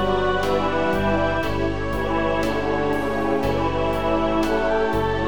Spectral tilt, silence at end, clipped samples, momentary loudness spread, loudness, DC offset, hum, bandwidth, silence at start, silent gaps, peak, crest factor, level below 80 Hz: -6.5 dB/octave; 0 s; under 0.1%; 2 LU; -22 LUFS; 2%; none; 19 kHz; 0 s; none; -8 dBFS; 12 dB; -36 dBFS